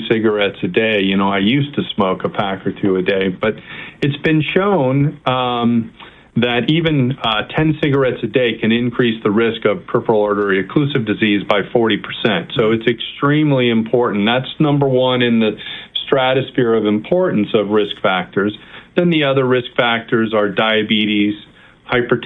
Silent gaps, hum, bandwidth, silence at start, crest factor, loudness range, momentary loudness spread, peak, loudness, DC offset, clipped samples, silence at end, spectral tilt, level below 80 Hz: none; none; 5 kHz; 0 s; 16 dB; 2 LU; 6 LU; 0 dBFS; -16 LUFS; under 0.1%; under 0.1%; 0 s; -8.5 dB/octave; -50 dBFS